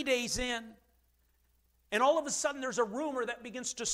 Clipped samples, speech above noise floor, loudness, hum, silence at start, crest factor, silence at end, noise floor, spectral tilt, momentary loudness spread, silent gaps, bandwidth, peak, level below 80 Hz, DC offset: under 0.1%; 39 dB; -33 LUFS; none; 0 s; 18 dB; 0 s; -71 dBFS; -2 dB/octave; 10 LU; none; 16 kHz; -16 dBFS; -58 dBFS; under 0.1%